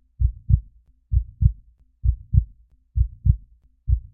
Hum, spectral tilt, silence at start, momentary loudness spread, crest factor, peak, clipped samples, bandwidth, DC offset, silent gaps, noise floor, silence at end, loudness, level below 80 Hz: none; -18.5 dB/octave; 0.2 s; 9 LU; 20 dB; -2 dBFS; under 0.1%; 0.4 kHz; under 0.1%; none; -52 dBFS; 0.15 s; -25 LUFS; -26 dBFS